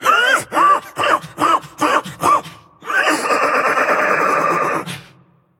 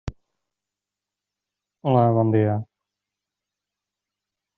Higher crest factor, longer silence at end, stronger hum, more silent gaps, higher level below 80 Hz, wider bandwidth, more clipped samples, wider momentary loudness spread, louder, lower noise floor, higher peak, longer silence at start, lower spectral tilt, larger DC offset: about the same, 16 dB vs 20 dB; second, 0.6 s vs 1.95 s; second, none vs 50 Hz at -60 dBFS; neither; second, -60 dBFS vs -50 dBFS; first, 17 kHz vs 5.8 kHz; neither; second, 6 LU vs 12 LU; first, -16 LUFS vs -21 LUFS; second, -51 dBFS vs -88 dBFS; first, 0 dBFS vs -6 dBFS; about the same, 0 s vs 0.05 s; second, -3 dB/octave vs -9 dB/octave; neither